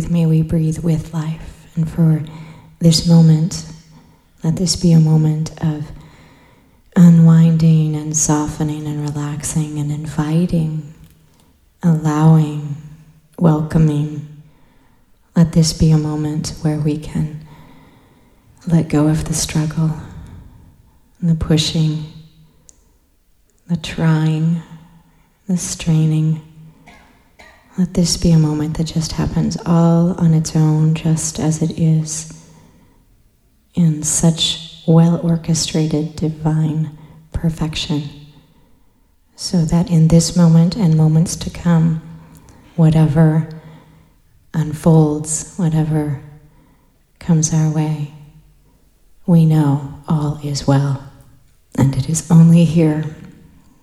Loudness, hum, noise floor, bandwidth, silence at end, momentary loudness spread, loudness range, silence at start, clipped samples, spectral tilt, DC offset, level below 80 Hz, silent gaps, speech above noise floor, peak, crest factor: -16 LUFS; none; -55 dBFS; 12.5 kHz; 0.5 s; 14 LU; 7 LU; 0 s; under 0.1%; -6 dB/octave; under 0.1%; -38 dBFS; none; 41 dB; 0 dBFS; 16 dB